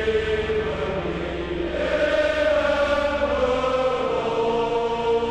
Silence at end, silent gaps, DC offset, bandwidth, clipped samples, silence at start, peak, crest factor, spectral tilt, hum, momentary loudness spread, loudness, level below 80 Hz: 0 s; none; under 0.1%; 9.8 kHz; under 0.1%; 0 s; -10 dBFS; 12 dB; -5.5 dB/octave; none; 6 LU; -23 LUFS; -40 dBFS